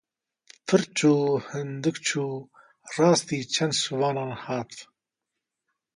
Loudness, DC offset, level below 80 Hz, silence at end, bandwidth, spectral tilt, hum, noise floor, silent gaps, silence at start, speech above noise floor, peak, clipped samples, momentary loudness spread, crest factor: -25 LUFS; under 0.1%; -70 dBFS; 1.15 s; 11.5 kHz; -4.5 dB/octave; none; -85 dBFS; none; 0.65 s; 60 dB; -8 dBFS; under 0.1%; 14 LU; 20 dB